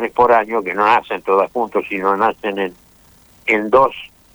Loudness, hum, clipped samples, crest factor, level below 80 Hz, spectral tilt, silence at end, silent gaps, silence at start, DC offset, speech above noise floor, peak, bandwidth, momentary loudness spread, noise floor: -16 LUFS; none; under 0.1%; 14 dB; -54 dBFS; -5.5 dB/octave; 0.3 s; none; 0 s; under 0.1%; 33 dB; -2 dBFS; over 20 kHz; 10 LU; -49 dBFS